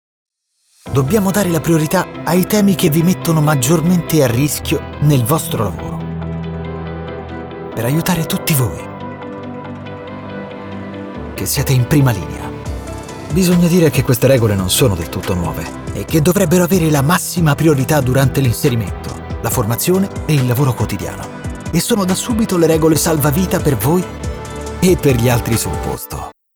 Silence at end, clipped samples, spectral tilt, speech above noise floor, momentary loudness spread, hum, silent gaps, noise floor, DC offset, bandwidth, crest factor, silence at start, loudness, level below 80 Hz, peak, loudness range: 0.25 s; under 0.1%; -5.5 dB/octave; 44 dB; 15 LU; none; none; -58 dBFS; under 0.1%; over 20 kHz; 14 dB; 0.85 s; -15 LUFS; -34 dBFS; -2 dBFS; 6 LU